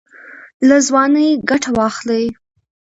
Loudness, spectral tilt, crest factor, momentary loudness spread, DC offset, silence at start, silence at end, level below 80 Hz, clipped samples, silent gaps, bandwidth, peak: -14 LUFS; -3.5 dB/octave; 16 dB; 7 LU; under 0.1%; 0.25 s; 0.6 s; -50 dBFS; under 0.1%; 0.54-0.60 s; 8 kHz; 0 dBFS